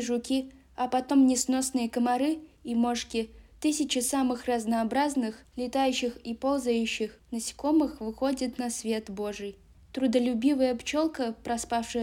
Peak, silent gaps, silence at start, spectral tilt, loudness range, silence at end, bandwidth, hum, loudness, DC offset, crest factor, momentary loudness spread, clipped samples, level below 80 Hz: -12 dBFS; none; 0 s; -3.5 dB/octave; 2 LU; 0 s; 16.5 kHz; none; -28 LUFS; under 0.1%; 16 dB; 9 LU; under 0.1%; -58 dBFS